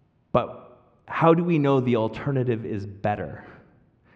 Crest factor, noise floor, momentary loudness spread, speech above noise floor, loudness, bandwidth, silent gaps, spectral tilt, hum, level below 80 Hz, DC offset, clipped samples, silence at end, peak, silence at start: 20 dB; -58 dBFS; 13 LU; 35 dB; -24 LUFS; 7 kHz; none; -9.5 dB/octave; none; -58 dBFS; under 0.1%; under 0.1%; 0.6 s; -6 dBFS; 0.35 s